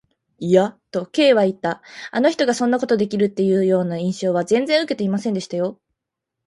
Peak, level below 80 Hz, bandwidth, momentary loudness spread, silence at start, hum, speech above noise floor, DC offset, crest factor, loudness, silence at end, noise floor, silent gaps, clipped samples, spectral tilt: -2 dBFS; -64 dBFS; 11.5 kHz; 9 LU; 0.4 s; none; 63 dB; under 0.1%; 18 dB; -19 LUFS; 0.75 s; -82 dBFS; none; under 0.1%; -5.5 dB/octave